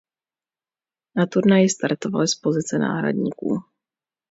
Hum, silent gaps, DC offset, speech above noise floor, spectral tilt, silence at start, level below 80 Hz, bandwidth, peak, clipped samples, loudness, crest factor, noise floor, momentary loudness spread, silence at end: none; none; under 0.1%; over 70 dB; -5 dB/octave; 1.15 s; -66 dBFS; 8 kHz; -4 dBFS; under 0.1%; -21 LUFS; 18 dB; under -90 dBFS; 10 LU; 0.7 s